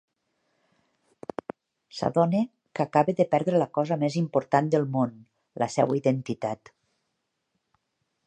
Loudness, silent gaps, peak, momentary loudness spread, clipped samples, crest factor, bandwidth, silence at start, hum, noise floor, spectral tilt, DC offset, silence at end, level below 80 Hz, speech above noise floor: -26 LUFS; none; -6 dBFS; 16 LU; under 0.1%; 22 dB; 9.6 kHz; 1.95 s; none; -79 dBFS; -7 dB/octave; under 0.1%; 1.7 s; -70 dBFS; 54 dB